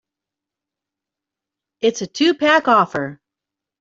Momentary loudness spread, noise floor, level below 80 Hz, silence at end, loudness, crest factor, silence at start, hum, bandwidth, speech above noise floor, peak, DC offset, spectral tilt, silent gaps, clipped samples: 10 LU; -86 dBFS; -66 dBFS; 0.65 s; -17 LUFS; 18 dB; 1.8 s; none; 7.8 kHz; 69 dB; -2 dBFS; under 0.1%; -4 dB/octave; none; under 0.1%